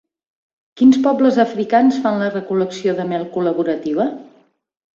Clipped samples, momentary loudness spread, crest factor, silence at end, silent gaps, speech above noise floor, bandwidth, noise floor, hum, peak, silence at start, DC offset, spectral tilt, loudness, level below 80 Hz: under 0.1%; 8 LU; 16 dB; 0.7 s; none; 41 dB; 7.4 kHz; -57 dBFS; none; -2 dBFS; 0.75 s; under 0.1%; -6.5 dB/octave; -17 LUFS; -62 dBFS